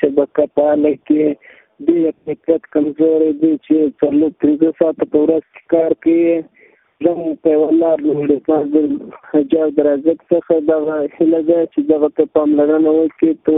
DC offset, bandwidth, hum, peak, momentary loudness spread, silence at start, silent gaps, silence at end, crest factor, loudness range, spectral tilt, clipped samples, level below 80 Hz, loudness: under 0.1%; 3.8 kHz; none; 0 dBFS; 5 LU; 0 s; none; 0 s; 14 dB; 1 LU; -12 dB/octave; under 0.1%; -58 dBFS; -15 LUFS